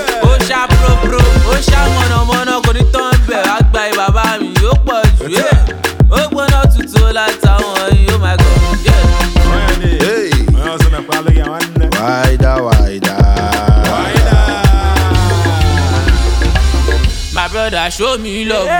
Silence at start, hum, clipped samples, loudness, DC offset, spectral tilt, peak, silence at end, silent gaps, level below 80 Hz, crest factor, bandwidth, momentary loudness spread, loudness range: 0 s; none; under 0.1%; -11 LUFS; under 0.1%; -5.5 dB/octave; 0 dBFS; 0 s; none; -12 dBFS; 10 dB; 19.5 kHz; 4 LU; 2 LU